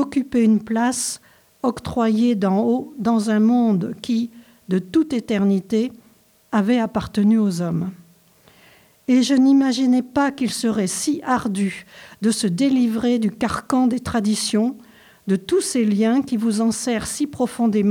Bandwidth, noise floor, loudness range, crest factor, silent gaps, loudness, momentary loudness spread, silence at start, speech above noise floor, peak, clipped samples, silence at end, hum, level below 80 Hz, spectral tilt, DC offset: 15.5 kHz; -55 dBFS; 2 LU; 12 dB; none; -20 LUFS; 8 LU; 0 s; 36 dB; -6 dBFS; under 0.1%; 0 s; none; -52 dBFS; -5 dB/octave; under 0.1%